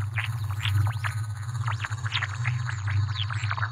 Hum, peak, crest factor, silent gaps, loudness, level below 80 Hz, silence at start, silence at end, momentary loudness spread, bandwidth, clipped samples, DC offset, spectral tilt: none; -14 dBFS; 14 dB; none; -29 LUFS; -54 dBFS; 0 s; 0 s; 5 LU; 13.5 kHz; under 0.1%; under 0.1%; -4 dB/octave